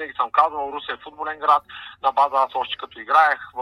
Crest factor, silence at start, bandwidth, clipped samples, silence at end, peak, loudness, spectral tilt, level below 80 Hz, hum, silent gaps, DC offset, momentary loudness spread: 20 dB; 0 s; 12.5 kHz; under 0.1%; 0 s; -2 dBFS; -21 LUFS; -3 dB/octave; -62 dBFS; none; none; under 0.1%; 14 LU